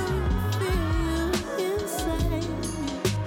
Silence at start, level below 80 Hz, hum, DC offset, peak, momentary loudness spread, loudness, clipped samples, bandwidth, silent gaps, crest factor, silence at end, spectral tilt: 0 s; -32 dBFS; none; under 0.1%; -10 dBFS; 3 LU; -27 LUFS; under 0.1%; 18 kHz; none; 16 dB; 0 s; -5.5 dB/octave